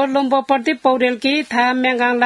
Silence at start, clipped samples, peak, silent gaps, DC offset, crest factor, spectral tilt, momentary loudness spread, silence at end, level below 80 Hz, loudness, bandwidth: 0 s; under 0.1%; 0 dBFS; none; under 0.1%; 16 dB; -3.5 dB/octave; 2 LU; 0 s; -68 dBFS; -16 LUFS; 12 kHz